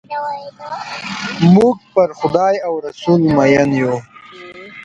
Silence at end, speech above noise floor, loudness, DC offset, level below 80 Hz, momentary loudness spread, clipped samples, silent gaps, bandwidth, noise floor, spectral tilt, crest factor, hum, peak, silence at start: 0 s; 22 dB; -15 LUFS; under 0.1%; -50 dBFS; 17 LU; under 0.1%; none; 9 kHz; -36 dBFS; -7 dB/octave; 16 dB; none; 0 dBFS; 0.1 s